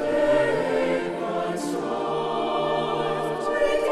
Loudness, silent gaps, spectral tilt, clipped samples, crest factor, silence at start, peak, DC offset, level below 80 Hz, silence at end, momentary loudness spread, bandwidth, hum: -25 LUFS; none; -5 dB/octave; under 0.1%; 16 dB; 0 s; -8 dBFS; under 0.1%; -52 dBFS; 0 s; 6 LU; 13 kHz; none